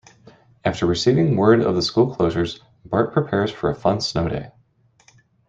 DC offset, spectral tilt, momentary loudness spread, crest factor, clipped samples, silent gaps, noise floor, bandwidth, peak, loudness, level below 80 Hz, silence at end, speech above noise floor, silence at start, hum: under 0.1%; -6.5 dB/octave; 10 LU; 18 dB; under 0.1%; none; -59 dBFS; 8 kHz; -2 dBFS; -20 LUFS; -48 dBFS; 1 s; 40 dB; 0.65 s; none